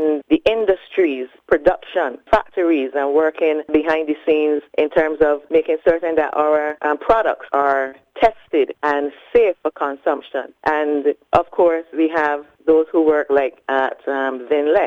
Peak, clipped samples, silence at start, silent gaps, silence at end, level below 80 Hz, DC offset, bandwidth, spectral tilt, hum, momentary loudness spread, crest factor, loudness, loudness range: -2 dBFS; under 0.1%; 0 s; none; 0 s; -48 dBFS; under 0.1%; 6.6 kHz; -6.5 dB/octave; none; 6 LU; 16 dB; -18 LUFS; 2 LU